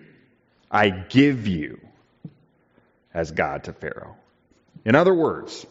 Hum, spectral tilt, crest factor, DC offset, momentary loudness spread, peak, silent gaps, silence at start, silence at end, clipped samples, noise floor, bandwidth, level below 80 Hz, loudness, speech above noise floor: none; -5 dB/octave; 20 dB; under 0.1%; 17 LU; -4 dBFS; none; 0.7 s; 0.05 s; under 0.1%; -61 dBFS; 7.8 kHz; -56 dBFS; -22 LUFS; 40 dB